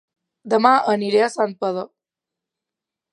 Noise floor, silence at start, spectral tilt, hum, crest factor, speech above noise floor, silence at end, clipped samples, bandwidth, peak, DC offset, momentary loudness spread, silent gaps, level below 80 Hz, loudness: -86 dBFS; 0.45 s; -5 dB/octave; none; 20 dB; 68 dB; 1.25 s; under 0.1%; 11 kHz; 0 dBFS; under 0.1%; 12 LU; none; -74 dBFS; -19 LUFS